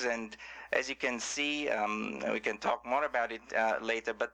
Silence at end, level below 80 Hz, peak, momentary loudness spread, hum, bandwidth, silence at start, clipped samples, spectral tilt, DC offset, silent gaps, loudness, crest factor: 0.05 s; -66 dBFS; -16 dBFS; 4 LU; none; 11 kHz; 0 s; under 0.1%; -2.5 dB/octave; under 0.1%; none; -33 LUFS; 18 dB